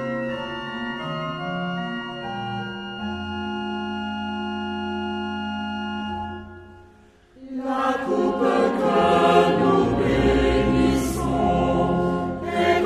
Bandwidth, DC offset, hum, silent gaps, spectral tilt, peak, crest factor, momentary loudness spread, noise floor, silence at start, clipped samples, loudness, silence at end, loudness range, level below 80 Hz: 14.5 kHz; under 0.1%; none; none; -6.5 dB/octave; -4 dBFS; 20 dB; 12 LU; -52 dBFS; 0 s; under 0.1%; -23 LUFS; 0 s; 10 LU; -38 dBFS